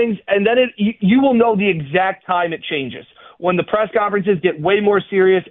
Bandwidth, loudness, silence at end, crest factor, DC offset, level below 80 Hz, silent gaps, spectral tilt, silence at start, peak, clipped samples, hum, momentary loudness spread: 4 kHz; -16 LUFS; 0.1 s; 14 dB; under 0.1%; -54 dBFS; none; -11 dB/octave; 0 s; -2 dBFS; under 0.1%; none; 8 LU